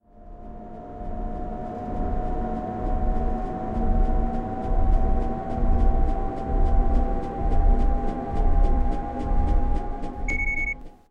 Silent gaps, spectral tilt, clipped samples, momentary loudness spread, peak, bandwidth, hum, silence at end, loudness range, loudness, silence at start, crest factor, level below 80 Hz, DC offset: none; -8.5 dB/octave; under 0.1%; 9 LU; -10 dBFS; 7 kHz; none; 0.2 s; 4 LU; -28 LUFS; 0.15 s; 12 dB; -24 dBFS; under 0.1%